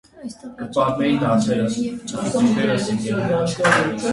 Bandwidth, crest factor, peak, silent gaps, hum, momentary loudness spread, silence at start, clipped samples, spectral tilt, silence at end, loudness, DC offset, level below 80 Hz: 11.5 kHz; 20 dB; 0 dBFS; none; none; 11 LU; 0.15 s; under 0.1%; -5.5 dB/octave; 0 s; -20 LUFS; under 0.1%; -52 dBFS